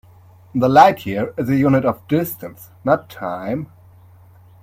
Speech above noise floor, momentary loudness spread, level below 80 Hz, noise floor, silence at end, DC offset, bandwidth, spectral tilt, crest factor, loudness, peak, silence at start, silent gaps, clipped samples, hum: 29 dB; 16 LU; -54 dBFS; -46 dBFS; 1 s; under 0.1%; 16.5 kHz; -7 dB/octave; 18 dB; -18 LUFS; 0 dBFS; 0.55 s; none; under 0.1%; none